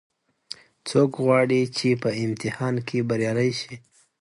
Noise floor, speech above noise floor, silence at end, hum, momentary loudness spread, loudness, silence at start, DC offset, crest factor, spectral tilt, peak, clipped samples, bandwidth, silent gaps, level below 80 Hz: -44 dBFS; 21 dB; 0.4 s; none; 19 LU; -23 LUFS; 0.85 s; under 0.1%; 18 dB; -6 dB/octave; -6 dBFS; under 0.1%; 11.5 kHz; none; -64 dBFS